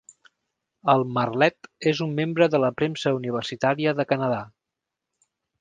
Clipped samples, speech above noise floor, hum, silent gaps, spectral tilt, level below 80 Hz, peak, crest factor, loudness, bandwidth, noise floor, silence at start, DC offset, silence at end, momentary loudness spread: under 0.1%; 62 dB; none; none; -6.5 dB/octave; -66 dBFS; -2 dBFS; 22 dB; -24 LUFS; 9.6 kHz; -85 dBFS; 0.85 s; under 0.1%; 1.15 s; 7 LU